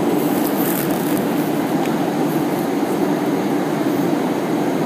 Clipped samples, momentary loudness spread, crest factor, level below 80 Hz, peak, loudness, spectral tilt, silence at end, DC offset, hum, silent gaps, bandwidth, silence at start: under 0.1%; 2 LU; 14 dB; -60 dBFS; -4 dBFS; -19 LUFS; -6 dB/octave; 0 s; under 0.1%; none; none; 15.5 kHz; 0 s